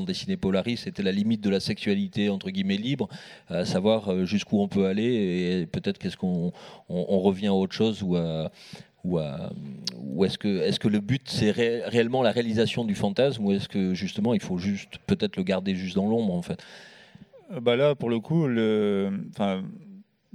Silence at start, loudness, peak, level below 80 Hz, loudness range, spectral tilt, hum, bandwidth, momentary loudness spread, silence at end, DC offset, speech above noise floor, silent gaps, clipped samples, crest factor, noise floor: 0 s; -26 LUFS; -6 dBFS; -60 dBFS; 3 LU; -6.5 dB/octave; none; 11.5 kHz; 10 LU; 0.35 s; under 0.1%; 25 dB; none; under 0.1%; 20 dB; -51 dBFS